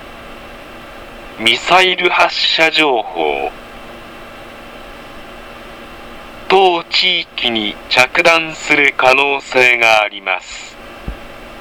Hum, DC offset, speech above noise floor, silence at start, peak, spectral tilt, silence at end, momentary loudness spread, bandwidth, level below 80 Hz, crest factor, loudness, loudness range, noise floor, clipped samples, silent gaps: none; under 0.1%; 20 dB; 0 s; 0 dBFS; -2.5 dB/octave; 0 s; 23 LU; over 20 kHz; -42 dBFS; 16 dB; -12 LUFS; 9 LU; -33 dBFS; under 0.1%; none